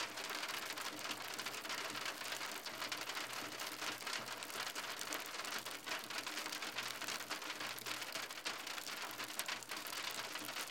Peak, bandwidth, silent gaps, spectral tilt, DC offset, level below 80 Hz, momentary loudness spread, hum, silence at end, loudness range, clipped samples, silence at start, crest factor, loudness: -20 dBFS; 17 kHz; none; -0.5 dB/octave; under 0.1%; -88 dBFS; 2 LU; none; 0 s; 0 LU; under 0.1%; 0 s; 24 dB; -43 LUFS